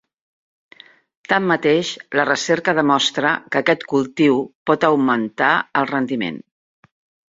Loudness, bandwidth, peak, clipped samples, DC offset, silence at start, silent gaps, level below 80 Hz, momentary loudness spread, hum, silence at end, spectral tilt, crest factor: -18 LUFS; 7.8 kHz; -2 dBFS; under 0.1%; under 0.1%; 1.3 s; 4.55-4.66 s; -62 dBFS; 5 LU; none; 0.9 s; -4.5 dB/octave; 18 dB